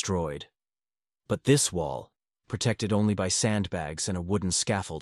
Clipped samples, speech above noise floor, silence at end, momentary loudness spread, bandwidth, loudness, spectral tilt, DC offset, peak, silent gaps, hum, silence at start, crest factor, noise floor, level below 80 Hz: under 0.1%; over 63 dB; 0 s; 11 LU; 12.5 kHz; -27 LUFS; -4.5 dB/octave; under 0.1%; -10 dBFS; none; none; 0 s; 18 dB; under -90 dBFS; -52 dBFS